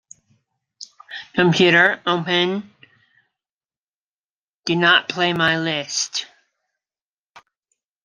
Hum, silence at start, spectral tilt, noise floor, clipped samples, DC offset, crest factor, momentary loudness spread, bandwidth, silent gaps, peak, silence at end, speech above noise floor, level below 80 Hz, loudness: none; 0.8 s; -3.5 dB/octave; under -90 dBFS; under 0.1%; under 0.1%; 22 dB; 21 LU; 10 kHz; 3.52-3.61 s, 3.77-4.60 s, 7.01-7.34 s; 0 dBFS; 0.65 s; over 72 dB; -64 dBFS; -18 LUFS